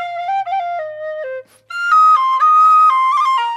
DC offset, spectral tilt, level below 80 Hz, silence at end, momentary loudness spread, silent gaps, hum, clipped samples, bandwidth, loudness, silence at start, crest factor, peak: under 0.1%; 0.5 dB/octave; -72 dBFS; 0 s; 17 LU; none; none; under 0.1%; 11.5 kHz; -12 LUFS; 0 s; 10 dB; -4 dBFS